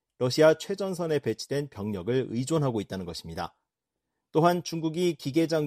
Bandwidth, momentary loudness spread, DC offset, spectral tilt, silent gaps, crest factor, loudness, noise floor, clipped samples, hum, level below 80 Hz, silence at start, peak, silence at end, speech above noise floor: 14.5 kHz; 14 LU; under 0.1%; -6 dB/octave; none; 20 dB; -28 LUFS; -86 dBFS; under 0.1%; none; -62 dBFS; 0.2 s; -8 dBFS; 0 s; 59 dB